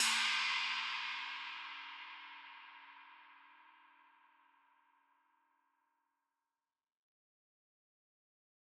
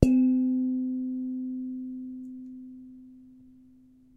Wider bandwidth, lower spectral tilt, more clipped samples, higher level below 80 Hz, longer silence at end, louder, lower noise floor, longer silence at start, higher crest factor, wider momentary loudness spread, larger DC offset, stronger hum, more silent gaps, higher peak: first, 13 kHz vs 8.6 kHz; second, 4 dB/octave vs -9.5 dB/octave; neither; second, under -90 dBFS vs -44 dBFS; first, 5 s vs 0.85 s; second, -37 LUFS vs -29 LUFS; first, under -90 dBFS vs -57 dBFS; about the same, 0 s vs 0 s; about the same, 26 dB vs 28 dB; about the same, 24 LU vs 23 LU; neither; neither; neither; second, -20 dBFS vs 0 dBFS